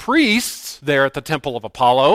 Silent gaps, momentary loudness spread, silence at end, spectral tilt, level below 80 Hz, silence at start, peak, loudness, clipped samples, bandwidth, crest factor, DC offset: none; 11 LU; 0 s; -4 dB/octave; -50 dBFS; 0 s; -2 dBFS; -18 LUFS; under 0.1%; 16 kHz; 16 dB; under 0.1%